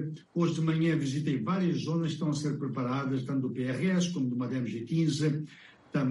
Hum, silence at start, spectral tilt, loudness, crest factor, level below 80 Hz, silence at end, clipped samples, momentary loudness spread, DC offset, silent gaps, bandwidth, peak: none; 0 s; -6.5 dB/octave; -31 LUFS; 14 dB; -68 dBFS; 0 s; under 0.1%; 5 LU; under 0.1%; none; 11.5 kHz; -16 dBFS